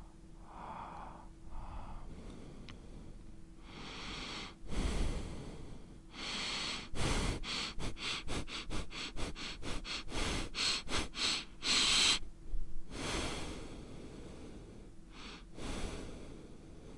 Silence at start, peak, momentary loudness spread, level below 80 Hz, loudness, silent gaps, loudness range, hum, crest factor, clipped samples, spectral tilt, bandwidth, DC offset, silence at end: 0 s; -18 dBFS; 20 LU; -46 dBFS; -37 LUFS; none; 16 LU; none; 22 dB; under 0.1%; -2.5 dB/octave; 11.5 kHz; under 0.1%; 0 s